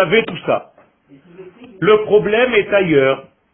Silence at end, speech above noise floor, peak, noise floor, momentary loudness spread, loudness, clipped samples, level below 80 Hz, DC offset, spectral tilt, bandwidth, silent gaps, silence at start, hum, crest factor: 0.3 s; 34 dB; 0 dBFS; -48 dBFS; 8 LU; -15 LUFS; under 0.1%; -52 dBFS; under 0.1%; -11 dB/octave; 3.9 kHz; none; 0 s; none; 16 dB